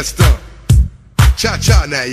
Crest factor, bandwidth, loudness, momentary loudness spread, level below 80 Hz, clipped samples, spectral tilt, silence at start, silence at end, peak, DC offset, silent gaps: 12 dB; 15 kHz; -13 LUFS; 4 LU; -16 dBFS; under 0.1%; -4.5 dB/octave; 0 s; 0 s; 0 dBFS; under 0.1%; none